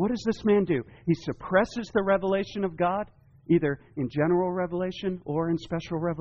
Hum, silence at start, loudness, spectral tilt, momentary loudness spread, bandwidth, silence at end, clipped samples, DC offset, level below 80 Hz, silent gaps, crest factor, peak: none; 0 s; -27 LUFS; -6 dB/octave; 7 LU; 7.2 kHz; 0 s; under 0.1%; under 0.1%; -54 dBFS; none; 16 dB; -10 dBFS